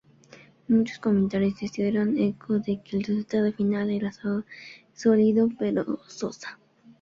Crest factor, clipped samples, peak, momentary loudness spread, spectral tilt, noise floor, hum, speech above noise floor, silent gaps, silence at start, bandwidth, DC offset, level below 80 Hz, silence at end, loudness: 16 dB; under 0.1%; -10 dBFS; 12 LU; -7.5 dB/octave; -53 dBFS; none; 28 dB; none; 0.7 s; 7.4 kHz; under 0.1%; -62 dBFS; 0.5 s; -26 LUFS